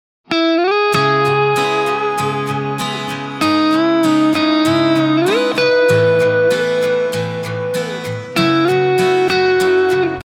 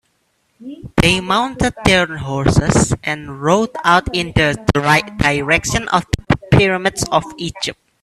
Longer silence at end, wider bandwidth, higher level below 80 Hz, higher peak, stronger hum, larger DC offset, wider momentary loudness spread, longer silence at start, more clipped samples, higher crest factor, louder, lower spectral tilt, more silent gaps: second, 0 s vs 0.3 s; first, 17 kHz vs 14 kHz; second, -58 dBFS vs -32 dBFS; about the same, -2 dBFS vs 0 dBFS; neither; neither; about the same, 8 LU vs 9 LU; second, 0.3 s vs 0.6 s; neither; about the same, 12 dB vs 16 dB; about the same, -15 LUFS vs -16 LUFS; about the same, -5.5 dB/octave vs -4.5 dB/octave; neither